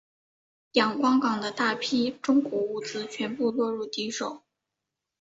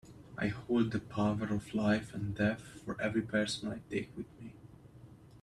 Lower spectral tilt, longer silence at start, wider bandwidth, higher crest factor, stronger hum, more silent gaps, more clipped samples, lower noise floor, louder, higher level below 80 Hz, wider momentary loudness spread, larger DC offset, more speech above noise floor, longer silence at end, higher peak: second, -4 dB/octave vs -6 dB/octave; first, 0.75 s vs 0.05 s; second, 8 kHz vs 12 kHz; about the same, 20 dB vs 18 dB; neither; neither; neither; first, -86 dBFS vs -55 dBFS; first, -27 LUFS vs -35 LUFS; second, -72 dBFS vs -62 dBFS; second, 10 LU vs 14 LU; neither; first, 59 dB vs 21 dB; first, 0.8 s vs 0 s; first, -8 dBFS vs -18 dBFS